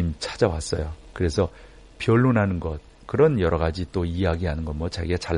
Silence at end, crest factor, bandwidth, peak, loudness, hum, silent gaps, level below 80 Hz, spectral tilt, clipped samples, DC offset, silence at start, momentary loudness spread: 0 s; 20 dB; 10.5 kHz; -4 dBFS; -24 LUFS; none; none; -36 dBFS; -6.5 dB/octave; under 0.1%; under 0.1%; 0 s; 10 LU